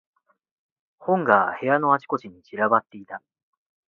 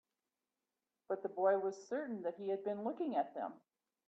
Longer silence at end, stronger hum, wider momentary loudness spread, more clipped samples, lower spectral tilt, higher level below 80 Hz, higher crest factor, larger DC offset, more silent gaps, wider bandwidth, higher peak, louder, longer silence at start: first, 0.7 s vs 0.5 s; neither; first, 20 LU vs 9 LU; neither; first, -8.5 dB/octave vs -6.5 dB/octave; first, -72 dBFS vs under -90 dBFS; about the same, 24 dB vs 20 dB; neither; neither; second, 6.6 kHz vs 7.8 kHz; first, -2 dBFS vs -22 dBFS; first, -22 LUFS vs -39 LUFS; about the same, 1 s vs 1.1 s